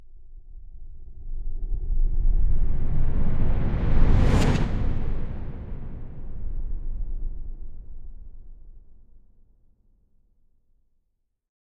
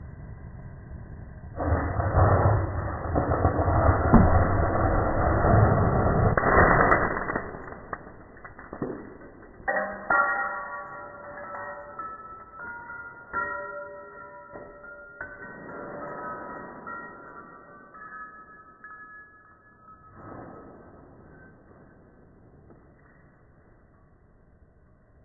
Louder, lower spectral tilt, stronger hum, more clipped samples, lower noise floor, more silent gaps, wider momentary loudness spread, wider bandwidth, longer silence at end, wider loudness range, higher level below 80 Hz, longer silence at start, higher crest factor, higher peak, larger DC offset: second, -28 LUFS vs -25 LUFS; second, -7.5 dB/octave vs -13 dB/octave; neither; neither; first, -74 dBFS vs -58 dBFS; neither; about the same, 25 LU vs 24 LU; first, 7.6 kHz vs 2.2 kHz; second, 2.7 s vs 4.3 s; second, 16 LU vs 23 LU; first, -24 dBFS vs -38 dBFS; about the same, 0 s vs 0 s; second, 18 dB vs 24 dB; about the same, -6 dBFS vs -4 dBFS; neither